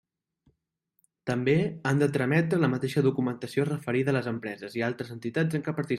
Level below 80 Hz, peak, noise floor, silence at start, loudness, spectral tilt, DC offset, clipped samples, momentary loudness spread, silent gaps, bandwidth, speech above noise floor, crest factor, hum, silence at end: -66 dBFS; -10 dBFS; -76 dBFS; 1.25 s; -28 LUFS; -7.5 dB/octave; under 0.1%; under 0.1%; 8 LU; none; 13.5 kHz; 49 dB; 18 dB; none; 0 s